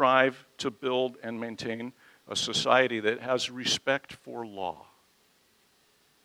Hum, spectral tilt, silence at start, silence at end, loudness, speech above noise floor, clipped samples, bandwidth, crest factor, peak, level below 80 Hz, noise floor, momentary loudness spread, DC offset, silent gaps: none; -3 dB/octave; 0 s; 1.45 s; -29 LUFS; 37 dB; under 0.1%; 16 kHz; 24 dB; -6 dBFS; -70 dBFS; -66 dBFS; 15 LU; under 0.1%; none